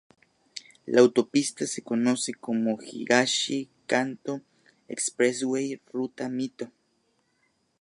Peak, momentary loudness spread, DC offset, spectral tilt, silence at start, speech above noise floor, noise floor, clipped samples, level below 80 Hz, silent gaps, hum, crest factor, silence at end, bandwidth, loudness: -4 dBFS; 18 LU; under 0.1%; -3.5 dB/octave; 0.55 s; 45 dB; -71 dBFS; under 0.1%; -76 dBFS; none; none; 22 dB; 1.15 s; 11.5 kHz; -26 LUFS